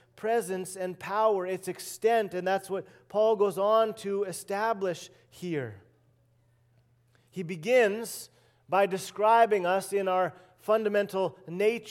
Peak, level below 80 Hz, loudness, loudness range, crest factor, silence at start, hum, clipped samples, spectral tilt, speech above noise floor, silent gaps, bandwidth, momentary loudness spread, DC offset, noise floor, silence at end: -10 dBFS; -78 dBFS; -28 LUFS; 7 LU; 18 dB; 0.15 s; none; under 0.1%; -4.5 dB/octave; 38 dB; none; 16.5 kHz; 14 LU; under 0.1%; -66 dBFS; 0 s